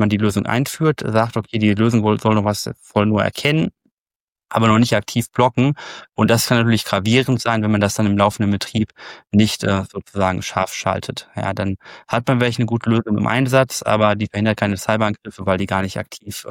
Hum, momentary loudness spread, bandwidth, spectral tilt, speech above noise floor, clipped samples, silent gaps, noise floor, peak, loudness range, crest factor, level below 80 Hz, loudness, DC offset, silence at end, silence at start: none; 9 LU; 17 kHz; -5.5 dB/octave; over 72 dB; under 0.1%; 3.92-4.05 s, 4.16-4.28 s; under -90 dBFS; -2 dBFS; 4 LU; 16 dB; -50 dBFS; -18 LUFS; under 0.1%; 0 s; 0 s